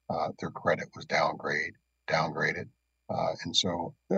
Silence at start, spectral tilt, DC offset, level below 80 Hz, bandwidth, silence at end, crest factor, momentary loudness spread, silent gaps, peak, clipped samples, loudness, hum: 0.1 s; -3.5 dB/octave; under 0.1%; -66 dBFS; 8.8 kHz; 0 s; 20 dB; 10 LU; none; -12 dBFS; under 0.1%; -31 LUFS; none